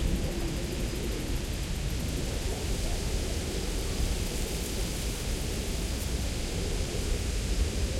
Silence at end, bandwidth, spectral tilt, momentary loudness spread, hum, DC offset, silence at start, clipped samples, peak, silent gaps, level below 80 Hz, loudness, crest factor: 0 s; 16.5 kHz; -4.5 dB/octave; 2 LU; none; under 0.1%; 0 s; under 0.1%; -16 dBFS; none; -32 dBFS; -33 LUFS; 14 dB